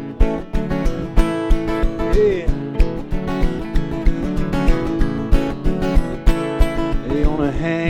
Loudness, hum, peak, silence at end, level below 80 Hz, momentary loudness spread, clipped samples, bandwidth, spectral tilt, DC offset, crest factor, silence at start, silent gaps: -21 LUFS; none; 0 dBFS; 0 s; -20 dBFS; 4 LU; under 0.1%; 9.2 kHz; -7.5 dB/octave; under 0.1%; 16 dB; 0 s; none